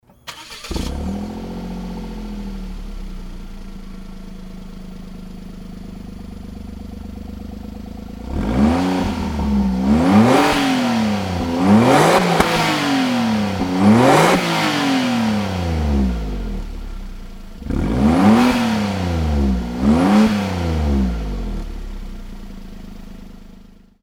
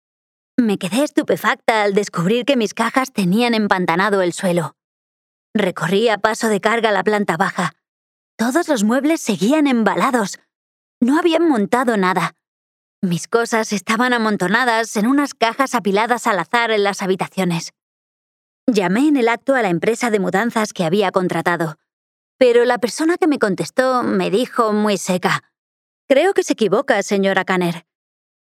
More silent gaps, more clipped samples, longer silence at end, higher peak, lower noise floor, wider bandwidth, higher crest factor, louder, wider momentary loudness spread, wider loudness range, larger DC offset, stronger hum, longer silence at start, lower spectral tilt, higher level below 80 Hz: second, none vs 4.84-5.54 s, 7.88-8.38 s, 10.55-11.01 s, 12.48-13.02 s, 17.82-18.67 s, 21.93-22.39 s, 25.58-26.08 s; neither; second, 0.3 s vs 0.7 s; about the same, 0 dBFS vs 0 dBFS; second, -43 dBFS vs under -90 dBFS; about the same, 17 kHz vs 16 kHz; about the same, 18 dB vs 18 dB; about the same, -17 LUFS vs -17 LUFS; first, 23 LU vs 6 LU; first, 19 LU vs 2 LU; neither; neither; second, 0.25 s vs 0.6 s; about the same, -6 dB/octave vs -5 dB/octave; first, -28 dBFS vs -68 dBFS